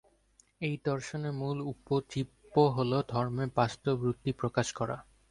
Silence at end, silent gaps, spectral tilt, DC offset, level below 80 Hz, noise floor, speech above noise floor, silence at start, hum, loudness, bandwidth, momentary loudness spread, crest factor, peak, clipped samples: 0.3 s; none; -6.5 dB/octave; under 0.1%; -60 dBFS; -67 dBFS; 36 dB; 0.6 s; none; -32 LUFS; 11.5 kHz; 10 LU; 20 dB; -12 dBFS; under 0.1%